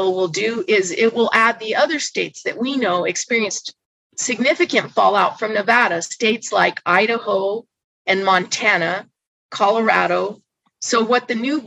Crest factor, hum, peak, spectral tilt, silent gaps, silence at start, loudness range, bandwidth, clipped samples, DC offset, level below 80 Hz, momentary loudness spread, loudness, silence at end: 18 dB; none; 0 dBFS; -3 dB/octave; 3.85-4.10 s, 7.84-8.05 s, 9.27-9.49 s; 0 s; 2 LU; 11 kHz; under 0.1%; under 0.1%; -70 dBFS; 9 LU; -18 LUFS; 0 s